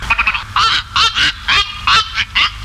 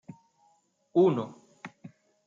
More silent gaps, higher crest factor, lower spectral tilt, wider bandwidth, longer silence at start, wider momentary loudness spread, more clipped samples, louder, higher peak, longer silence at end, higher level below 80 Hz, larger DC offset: neither; second, 14 dB vs 20 dB; second, -0.5 dB/octave vs -8.5 dB/octave; first, 15.5 kHz vs 7.4 kHz; second, 0 s vs 0.95 s; second, 2 LU vs 23 LU; neither; first, -12 LUFS vs -26 LUFS; first, -2 dBFS vs -12 dBFS; second, 0 s vs 0.4 s; first, -32 dBFS vs -76 dBFS; neither